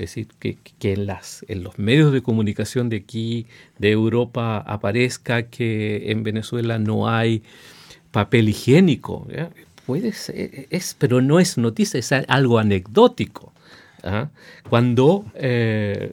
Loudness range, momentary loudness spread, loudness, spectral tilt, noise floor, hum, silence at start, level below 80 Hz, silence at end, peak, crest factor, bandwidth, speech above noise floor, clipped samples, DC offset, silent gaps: 4 LU; 14 LU; -20 LUFS; -6 dB/octave; -48 dBFS; none; 0 s; -56 dBFS; 0 s; 0 dBFS; 20 dB; 16.5 kHz; 28 dB; under 0.1%; under 0.1%; none